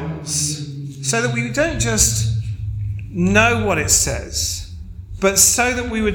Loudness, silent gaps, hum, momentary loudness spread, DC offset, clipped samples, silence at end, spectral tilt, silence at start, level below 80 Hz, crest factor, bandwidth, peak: -17 LUFS; none; none; 15 LU; under 0.1%; under 0.1%; 0 s; -3 dB/octave; 0 s; -32 dBFS; 18 dB; 17.5 kHz; 0 dBFS